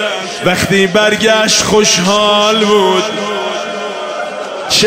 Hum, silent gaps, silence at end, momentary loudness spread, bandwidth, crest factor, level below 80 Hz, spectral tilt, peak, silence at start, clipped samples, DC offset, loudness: none; none; 0 s; 11 LU; 16 kHz; 12 dB; -44 dBFS; -2.5 dB/octave; 0 dBFS; 0 s; under 0.1%; under 0.1%; -11 LUFS